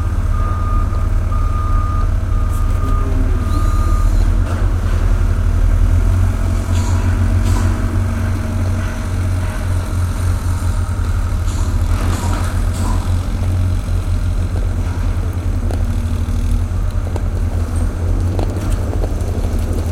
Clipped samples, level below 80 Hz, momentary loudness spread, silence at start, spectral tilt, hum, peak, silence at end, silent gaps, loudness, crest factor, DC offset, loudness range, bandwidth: under 0.1%; -18 dBFS; 4 LU; 0 s; -7 dB/octave; none; -2 dBFS; 0 s; none; -18 LUFS; 12 dB; under 0.1%; 3 LU; 13.5 kHz